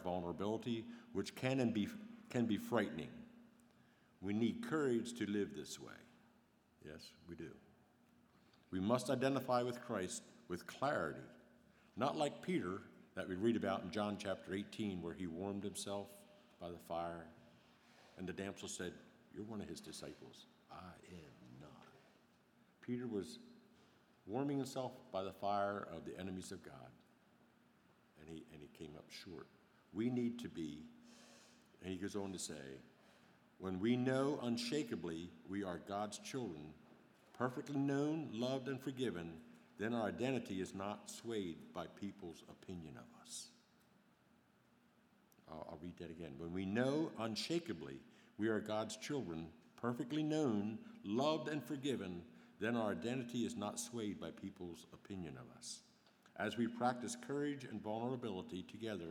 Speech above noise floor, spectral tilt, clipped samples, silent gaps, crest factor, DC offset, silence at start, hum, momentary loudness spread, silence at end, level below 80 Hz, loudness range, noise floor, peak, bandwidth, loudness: 30 dB; -5.5 dB/octave; under 0.1%; none; 24 dB; under 0.1%; 0 s; none; 19 LU; 0 s; -76 dBFS; 11 LU; -73 dBFS; -20 dBFS; 19 kHz; -43 LUFS